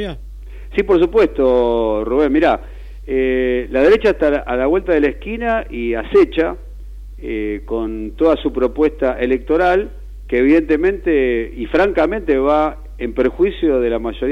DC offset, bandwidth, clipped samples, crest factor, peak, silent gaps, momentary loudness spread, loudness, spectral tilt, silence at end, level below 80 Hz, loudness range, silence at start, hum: under 0.1%; 7.4 kHz; under 0.1%; 12 dB; -4 dBFS; none; 13 LU; -16 LUFS; -7.5 dB/octave; 0 s; -32 dBFS; 3 LU; 0 s; none